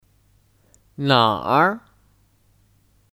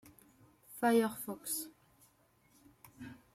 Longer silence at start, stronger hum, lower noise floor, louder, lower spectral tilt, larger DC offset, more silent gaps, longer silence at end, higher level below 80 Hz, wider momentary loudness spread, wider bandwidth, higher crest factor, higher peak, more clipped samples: first, 1 s vs 0.05 s; neither; second, -59 dBFS vs -70 dBFS; first, -18 LUFS vs -34 LUFS; first, -6.5 dB/octave vs -4 dB/octave; neither; neither; first, 1.35 s vs 0.2 s; first, -60 dBFS vs -78 dBFS; second, 10 LU vs 22 LU; about the same, 16 kHz vs 16 kHz; about the same, 22 dB vs 20 dB; first, -2 dBFS vs -18 dBFS; neither